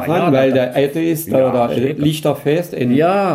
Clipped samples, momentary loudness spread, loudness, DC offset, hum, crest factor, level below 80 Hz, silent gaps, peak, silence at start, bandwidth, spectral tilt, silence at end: under 0.1%; 4 LU; -15 LUFS; under 0.1%; none; 14 dB; -54 dBFS; none; -2 dBFS; 0 s; 16 kHz; -6.5 dB/octave; 0 s